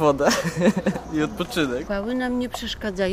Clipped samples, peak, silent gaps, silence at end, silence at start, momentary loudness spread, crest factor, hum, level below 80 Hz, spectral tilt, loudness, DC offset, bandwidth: under 0.1%; -4 dBFS; none; 0 s; 0 s; 7 LU; 18 dB; none; -44 dBFS; -5 dB/octave; -24 LUFS; under 0.1%; 16 kHz